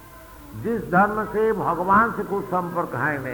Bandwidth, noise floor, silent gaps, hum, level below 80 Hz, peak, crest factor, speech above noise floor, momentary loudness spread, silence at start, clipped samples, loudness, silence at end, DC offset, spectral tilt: 19.5 kHz; -43 dBFS; none; none; -48 dBFS; -6 dBFS; 16 dB; 21 dB; 9 LU; 0 s; under 0.1%; -22 LUFS; 0 s; under 0.1%; -7.5 dB/octave